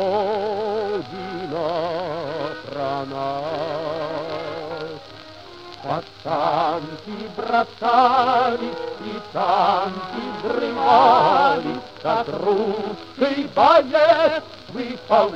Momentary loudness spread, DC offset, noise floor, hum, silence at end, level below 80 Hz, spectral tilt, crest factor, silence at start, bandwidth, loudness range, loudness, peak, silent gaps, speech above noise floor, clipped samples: 16 LU; 0.2%; -40 dBFS; none; 0 s; -58 dBFS; -6 dB/octave; 18 dB; 0 s; 8.8 kHz; 9 LU; -21 LUFS; -2 dBFS; none; 22 dB; under 0.1%